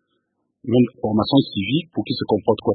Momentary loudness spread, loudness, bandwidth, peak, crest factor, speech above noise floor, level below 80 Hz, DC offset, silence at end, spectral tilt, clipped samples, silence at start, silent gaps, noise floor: 7 LU; -20 LUFS; 4.7 kHz; -2 dBFS; 18 dB; 53 dB; -54 dBFS; under 0.1%; 0 s; -12 dB/octave; under 0.1%; 0.65 s; none; -72 dBFS